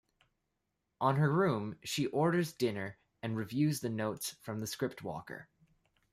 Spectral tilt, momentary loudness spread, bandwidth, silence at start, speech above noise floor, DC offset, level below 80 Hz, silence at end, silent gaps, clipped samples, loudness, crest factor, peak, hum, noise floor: -5.5 dB/octave; 14 LU; 15.5 kHz; 1 s; 50 dB; under 0.1%; -72 dBFS; 0.7 s; none; under 0.1%; -34 LUFS; 20 dB; -16 dBFS; none; -84 dBFS